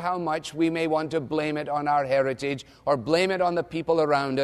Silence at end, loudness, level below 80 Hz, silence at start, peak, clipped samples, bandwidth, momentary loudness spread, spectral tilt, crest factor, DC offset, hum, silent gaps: 0 s; -25 LUFS; -60 dBFS; 0 s; -8 dBFS; under 0.1%; 12.5 kHz; 6 LU; -5.5 dB/octave; 16 dB; under 0.1%; none; none